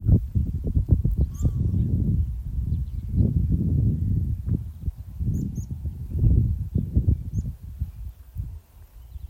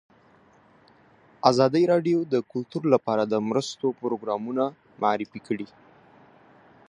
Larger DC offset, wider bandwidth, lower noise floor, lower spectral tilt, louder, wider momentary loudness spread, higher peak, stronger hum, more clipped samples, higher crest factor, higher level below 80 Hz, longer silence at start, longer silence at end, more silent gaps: neither; first, 15 kHz vs 10.5 kHz; second, -46 dBFS vs -57 dBFS; first, -10.5 dB/octave vs -6 dB/octave; about the same, -26 LUFS vs -25 LUFS; about the same, 13 LU vs 11 LU; second, -6 dBFS vs -2 dBFS; neither; neither; second, 18 dB vs 24 dB; first, -28 dBFS vs -72 dBFS; second, 0 s vs 1.45 s; second, 0.05 s vs 1.25 s; neither